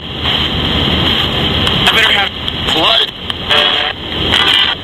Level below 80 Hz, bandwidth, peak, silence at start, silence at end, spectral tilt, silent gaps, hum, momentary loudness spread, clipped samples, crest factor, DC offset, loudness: -28 dBFS; 17 kHz; 0 dBFS; 0 s; 0 s; -4 dB/octave; none; none; 7 LU; under 0.1%; 12 dB; under 0.1%; -11 LUFS